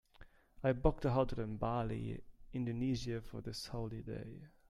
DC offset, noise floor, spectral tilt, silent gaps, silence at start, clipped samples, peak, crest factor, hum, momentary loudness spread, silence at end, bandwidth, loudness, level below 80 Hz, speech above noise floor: under 0.1%; -61 dBFS; -7 dB/octave; none; 0.2 s; under 0.1%; -16 dBFS; 24 dB; none; 13 LU; 0.2 s; 13.5 kHz; -39 LUFS; -48 dBFS; 23 dB